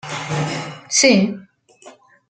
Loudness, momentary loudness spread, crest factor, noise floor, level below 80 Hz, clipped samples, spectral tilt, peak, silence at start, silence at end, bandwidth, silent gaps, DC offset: -17 LUFS; 14 LU; 20 dB; -46 dBFS; -60 dBFS; under 0.1%; -3.5 dB/octave; -2 dBFS; 0.05 s; 0.4 s; 9.4 kHz; none; under 0.1%